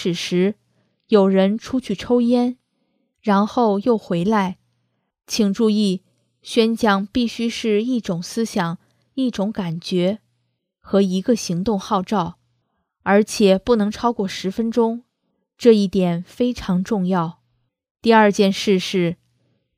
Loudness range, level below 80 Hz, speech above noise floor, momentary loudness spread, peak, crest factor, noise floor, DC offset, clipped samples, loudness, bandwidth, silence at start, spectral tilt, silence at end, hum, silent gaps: 4 LU; -52 dBFS; 54 dB; 10 LU; 0 dBFS; 20 dB; -72 dBFS; under 0.1%; under 0.1%; -19 LUFS; 15 kHz; 0 s; -6 dB/octave; 0.65 s; none; 17.91-17.95 s